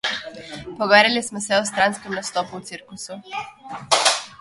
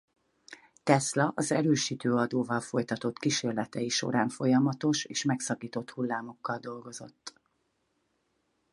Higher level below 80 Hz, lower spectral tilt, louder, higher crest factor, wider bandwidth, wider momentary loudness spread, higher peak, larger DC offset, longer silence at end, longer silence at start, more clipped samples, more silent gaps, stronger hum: first, -60 dBFS vs -74 dBFS; second, -1.5 dB/octave vs -4.5 dB/octave; first, -19 LUFS vs -29 LUFS; about the same, 22 dB vs 24 dB; about the same, 12 kHz vs 11.5 kHz; first, 20 LU vs 13 LU; first, 0 dBFS vs -6 dBFS; neither; second, 0.05 s vs 1.45 s; second, 0.05 s vs 0.5 s; neither; neither; neither